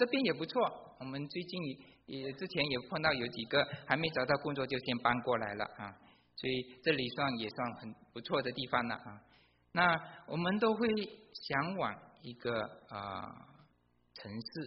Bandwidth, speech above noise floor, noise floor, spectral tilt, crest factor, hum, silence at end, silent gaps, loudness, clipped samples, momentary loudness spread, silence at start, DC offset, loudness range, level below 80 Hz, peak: 5.6 kHz; 36 dB; -72 dBFS; -3 dB/octave; 24 dB; none; 0 s; none; -36 LUFS; under 0.1%; 16 LU; 0 s; under 0.1%; 4 LU; -68 dBFS; -12 dBFS